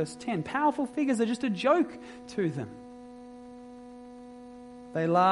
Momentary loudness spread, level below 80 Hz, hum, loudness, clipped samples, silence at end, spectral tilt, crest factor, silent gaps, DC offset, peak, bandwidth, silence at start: 21 LU; -66 dBFS; none; -29 LUFS; under 0.1%; 0 s; -6 dB/octave; 18 dB; none; under 0.1%; -12 dBFS; 11.5 kHz; 0 s